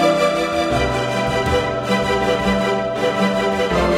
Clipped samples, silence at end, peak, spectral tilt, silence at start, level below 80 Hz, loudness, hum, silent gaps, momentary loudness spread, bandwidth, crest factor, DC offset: under 0.1%; 0 s; -4 dBFS; -5 dB/octave; 0 s; -34 dBFS; -18 LUFS; none; none; 2 LU; 16 kHz; 14 dB; under 0.1%